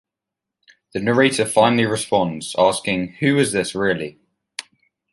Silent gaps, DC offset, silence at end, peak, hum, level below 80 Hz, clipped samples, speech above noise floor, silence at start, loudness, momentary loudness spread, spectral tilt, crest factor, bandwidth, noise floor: none; under 0.1%; 0.5 s; -2 dBFS; none; -56 dBFS; under 0.1%; 66 dB; 0.95 s; -19 LUFS; 17 LU; -4.5 dB/octave; 18 dB; 11.5 kHz; -85 dBFS